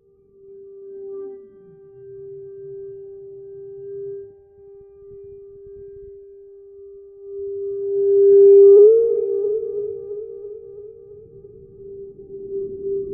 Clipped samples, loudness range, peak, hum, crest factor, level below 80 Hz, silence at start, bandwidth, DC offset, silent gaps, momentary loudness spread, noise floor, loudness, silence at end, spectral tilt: under 0.1%; 23 LU; -4 dBFS; none; 16 dB; -60 dBFS; 0.8 s; 1.3 kHz; under 0.1%; none; 29 LU; -50 dBFS; -15 LUFS; 0 s; -9.5 dB/octave